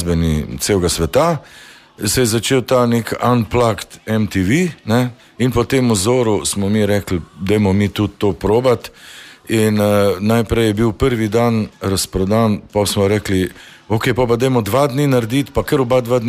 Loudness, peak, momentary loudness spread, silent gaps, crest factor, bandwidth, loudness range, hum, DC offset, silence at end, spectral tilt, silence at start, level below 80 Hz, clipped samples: -16 LUFS; -2 dBFS; 6 LU; none; 14 dB; 15.5 kHz; 1 LU; none; under 0.1%; 0 s; -5.5 dB/octave; 0 s; -36 dBFS; under 0.1%